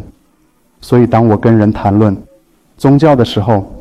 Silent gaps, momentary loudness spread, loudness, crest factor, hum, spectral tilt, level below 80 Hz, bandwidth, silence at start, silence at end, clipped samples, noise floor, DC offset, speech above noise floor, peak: none; 6 LU; -10 LUFS; 12 dB; none; -8.5 dB/octave; -38 dBFS; 12.5 kHz; 0 s; 0 s; under 0.1%; -54 dBFS; under 0.1%; 45 dB; 0 dBFS